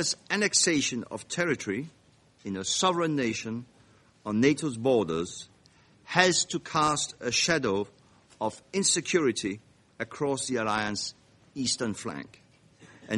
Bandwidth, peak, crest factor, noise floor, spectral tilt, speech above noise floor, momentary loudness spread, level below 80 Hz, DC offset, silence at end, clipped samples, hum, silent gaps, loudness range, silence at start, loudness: 11.5 kHz; -2 dBFS; 28 dB; -60 dBFS; -3 dB/octave; 32 dB; 16 LU; -64 dBFS; under 0.1%; 0 s; under 0.1%; none; none; 4 LU; 0 s; -27 LUFS